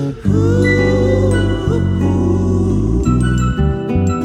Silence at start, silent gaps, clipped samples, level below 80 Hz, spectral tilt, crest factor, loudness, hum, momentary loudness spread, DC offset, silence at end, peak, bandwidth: 0 s; none; under 0.1%; -24 dBFS; -7.5 dB/octave; 12 dB; -15 LUFS; none; 4 LU; under 0.1%; 0 s; -2 dBFS; 9 kHz